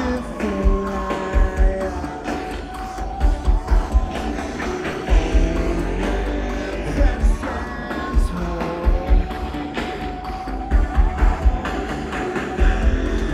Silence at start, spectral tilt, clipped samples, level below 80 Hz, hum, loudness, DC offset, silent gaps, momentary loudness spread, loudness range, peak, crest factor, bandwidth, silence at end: 0 s; -6.5 dB/octave; under 0.1%; -20 dBFS; none; -23 LUFS; under 0.1%; none; 7 LU; 1 LU; -4 dBFS; 16 dB; 10 kHz; 0 s